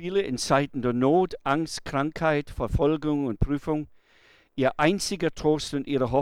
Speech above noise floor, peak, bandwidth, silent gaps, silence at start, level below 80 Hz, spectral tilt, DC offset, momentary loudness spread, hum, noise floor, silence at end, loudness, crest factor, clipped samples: 34 dB; -8 dBFS; 15.5 kHz; none; 0 s; -42 dBFS; -5.5 dB/octave; under 0.1%; 6 LU; none; -59 dBFS; 0 s; -26 LUFS; 18 dB; under 0.1%